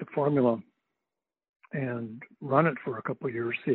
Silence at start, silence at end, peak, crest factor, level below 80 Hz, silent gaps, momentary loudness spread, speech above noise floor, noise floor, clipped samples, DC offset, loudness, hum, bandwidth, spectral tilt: 0 s; 0 s; -10 dBFS; 20 dB; -76 dBFS; 1.49-1.60 s; 13 LU; 61 dB; -89 dBFS; under 0.1%; under 0.1%; -29 LUFS; none; 4.3 kHz; -11 dB/octave